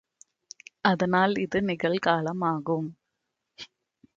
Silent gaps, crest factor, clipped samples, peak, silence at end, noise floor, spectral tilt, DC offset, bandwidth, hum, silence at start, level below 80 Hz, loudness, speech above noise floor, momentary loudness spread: none; 22 dB; under 0.1%; -8 dBFS; 0.5 s; -82 dBFS; -6 dB/octave; under 0.1%; 7.8 kHz; none; 0.85 s; -64 dBFS; -26 LUFS; 56 dB; 22 LU